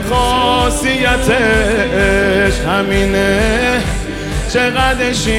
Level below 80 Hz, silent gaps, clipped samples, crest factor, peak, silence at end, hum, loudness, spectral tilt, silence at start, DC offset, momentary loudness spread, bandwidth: -22 dBFS; none; under 0.1%; 12 dB; 0 dBFS; 0 s; none; -13 LUFS; -4.5 dB/octave; 0 s; under 0.1%; 5 LU; 16.5 kHz